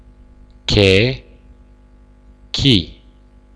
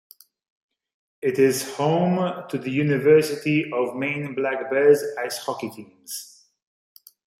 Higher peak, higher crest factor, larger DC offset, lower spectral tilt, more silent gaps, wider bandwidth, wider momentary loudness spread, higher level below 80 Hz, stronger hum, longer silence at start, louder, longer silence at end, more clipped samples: first, 0 dBFS vs -4 dBFS; about the same, 20 dB vs 20 dB; neither; about the same, -5.5 dB/octave vs -5.5 dB/octave; neither; second, 11 kHz vs 16 kHz; about the same, 17 LU vs 16 LU; first, -34 dBFS vs -70 dBFS; first, 50 Hz at -40 dBFS vs none; second, 0.7 s vs 1.25 s; first, -15 LUFS vs -22 LUFS; second, 0.65 s vs 1.15 s; neither